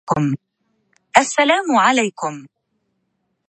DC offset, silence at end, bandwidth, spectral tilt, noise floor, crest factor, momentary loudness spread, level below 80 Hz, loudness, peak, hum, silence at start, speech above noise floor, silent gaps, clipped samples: under 0.1%; 1 s; 11 kHz; -4 dB/octave; -71 dBFS; 20 dB; 13 LU; -58 dBFS; -17 LUFS; 0 dBFS; none; 0.05 s; 54 dB; none; under 0.1%